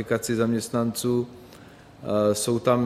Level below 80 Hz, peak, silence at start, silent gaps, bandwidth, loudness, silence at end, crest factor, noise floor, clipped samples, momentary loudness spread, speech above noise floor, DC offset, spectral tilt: -60 dBFS; -8 dBFS; 0 s; none; 15.5 kHz; -25 LUFS; 0 s; 18 dB; -47 dBFS; under 0.1%; 6 LU; 24 dB; under 0.1%; -5 dB/octave